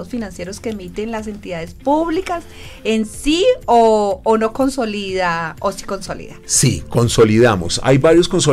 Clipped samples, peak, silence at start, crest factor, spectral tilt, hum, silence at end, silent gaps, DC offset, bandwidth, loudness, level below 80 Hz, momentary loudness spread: under 0.1%; -2 dBFS; 0 s; 14 dB; -4.5 dB/octave; none; 0 s; none; under 0.1%; 16 kHz; -16 LUFS; -36 dBFS; 14 LU